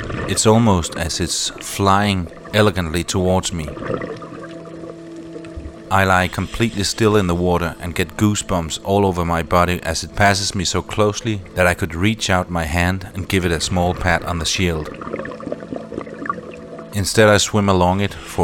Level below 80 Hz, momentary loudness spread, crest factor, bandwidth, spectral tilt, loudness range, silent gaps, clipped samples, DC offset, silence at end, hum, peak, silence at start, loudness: -36 dBFS; 15 LU; 18 dB; 17.5 kHz; -4.5 dB/octave; 4 LU; none; under 0.1%; under 0.1%; 0 s; none; -2 dBFS; 0 s; -18 LUFS